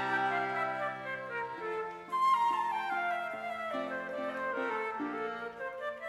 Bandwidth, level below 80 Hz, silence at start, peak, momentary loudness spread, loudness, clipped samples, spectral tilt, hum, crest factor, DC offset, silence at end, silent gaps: 14.5 kHz; -76 dBFS; 0 s; -18 dBFS; 10 LU; -34 LUFS; under 0.1%; -4.5 dB/octave; none; 16 dB; under 0.1%; 0 s; none